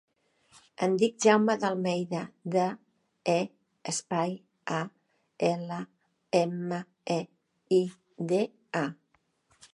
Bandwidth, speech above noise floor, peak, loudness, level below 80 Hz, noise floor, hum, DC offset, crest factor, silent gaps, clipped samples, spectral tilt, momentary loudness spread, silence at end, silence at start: 11.5 kHz; 44 dB; -8 dBFS; -30 LUFS; -80 dBFS; -72 dBFS; none; under 0.1%; 22 dB; none; under 0.1%; -5 dB/octave; 14 LU; 0.8 s; 0.8 s